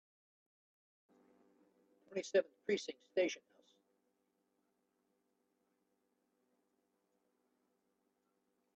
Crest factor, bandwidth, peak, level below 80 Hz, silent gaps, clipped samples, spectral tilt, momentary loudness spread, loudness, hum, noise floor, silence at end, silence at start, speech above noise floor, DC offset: 26 dB; 7.6 kHz; -22 dBFS; under -90 dBFS; none; under 0.1%; -3 dB/octave; 10 LU; -39 LUFS; none; -83 dBFS; 5.4 s; 2.1 s; 44 dB; under 0.1%